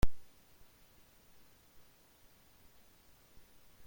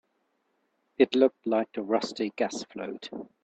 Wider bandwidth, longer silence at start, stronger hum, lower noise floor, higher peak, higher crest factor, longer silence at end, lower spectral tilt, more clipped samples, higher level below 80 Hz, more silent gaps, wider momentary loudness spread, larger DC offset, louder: first, 16.5 kHz vs 8.6 kHz; second, 0.05 s vs 1 s; neither; second, -64 dBFS vs -75 dBFS; second, -16 dBFS vs -8 dBFS; about the same, 22 dB vs 22 dB; first, 2.45 s vs 0.2 s; about the same, -5.5 dB/octave vs -4.5 dB/octave; neither; first, -48 dBFS vs -74 dBFS; neither; second, 1 LU vs 16 LU; neither; second, -57 LUFS vs -28 LUFS